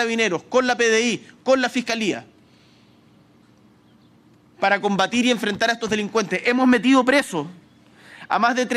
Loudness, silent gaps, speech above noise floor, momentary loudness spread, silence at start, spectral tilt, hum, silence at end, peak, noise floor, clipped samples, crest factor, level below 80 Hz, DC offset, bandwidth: -20 LUFS; none; 34 dB; 9 LU; 0 s; -3.5 dB/octave; none; 0 s; -4 dBFS; -54 dBFS; under 0.1%; 16 dB; -64 dBFS; under 0.1%; 13.5 kHz